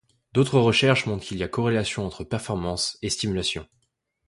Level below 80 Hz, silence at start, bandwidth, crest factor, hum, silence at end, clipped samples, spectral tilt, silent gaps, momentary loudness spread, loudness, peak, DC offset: -48 dBFS; 0.35 s; 11.5 kHz; 20 dB; none; 0.65 s; under 0.1%; -4.5 dB/octave; none; 11 LU; -24 LUFS; -4 dBFS; under 0.1%